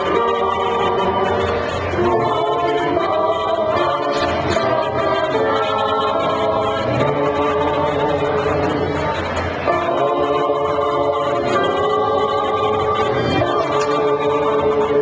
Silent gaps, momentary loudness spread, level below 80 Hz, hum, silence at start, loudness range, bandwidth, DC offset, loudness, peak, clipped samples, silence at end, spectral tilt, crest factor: none; 2 LU; -40 dBFS; none; 0 s; 1 LU; 8 kHz; under 0.1%; -18 LUFS; -4 dBFS; under 0.1%; 0 s; -6 dB/octave; 14 dB